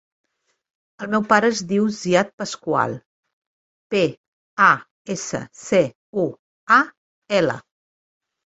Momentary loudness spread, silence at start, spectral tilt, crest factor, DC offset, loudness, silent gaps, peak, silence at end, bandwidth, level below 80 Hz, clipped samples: 14 LU; 1 s; -4.5 dB/octave; 20 dB; under 0.1%; -20 LUFS; 2.33-2.38 s, 3.06-3.23 s, 3.33-3.90 s, 4.17-4.57 s, 4.91-5.05 s, 5.95-6.13 s, 6.39-6.67 s, 6.97-7.22 s; -2 dBFS; 0.85 s; 8.2 kHz; -64 dBFS; under 0.1%